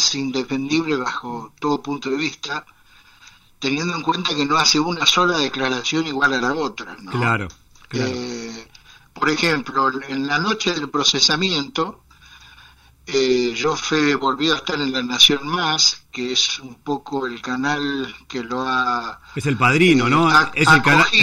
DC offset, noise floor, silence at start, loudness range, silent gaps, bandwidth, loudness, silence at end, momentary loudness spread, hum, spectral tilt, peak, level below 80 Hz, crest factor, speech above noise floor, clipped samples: under 0.1%; -50 dBFS; 0 s; 7 LU; none; 16 kHz; -18 LUFS; 0 s; 14 LU; none; -3 dB/octave; 0 dBFS; -52 dBFS; 20 dB; 30 dB; under 0.1%